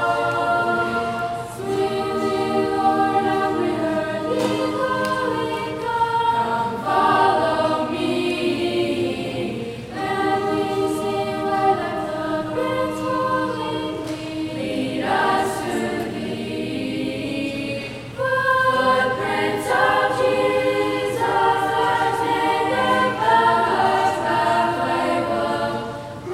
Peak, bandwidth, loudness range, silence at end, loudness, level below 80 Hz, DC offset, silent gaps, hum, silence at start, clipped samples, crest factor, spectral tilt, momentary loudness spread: -4 dBFS; 16 kHz; 5 LU; 0 s; -21 LUFS; -52 dBFS; under 0.1%; none; none; 0 s; under 0.1%; 16 dB; -5 dB/octave; 9 LU